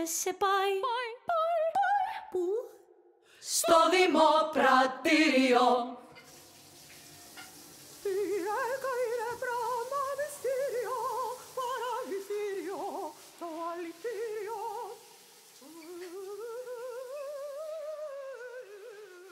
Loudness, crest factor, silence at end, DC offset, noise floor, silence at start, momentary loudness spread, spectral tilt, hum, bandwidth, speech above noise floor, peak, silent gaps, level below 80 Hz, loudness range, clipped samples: -30 LUFS; 20 dB; 0 s; under 0.1%; -61 dBFS; 0 s; 24 LU; -1.5 dB/octave; none; 16 kHz; 34 dB; -12 dBFS; none; -74 dBFS; 16 LU; under 0.1%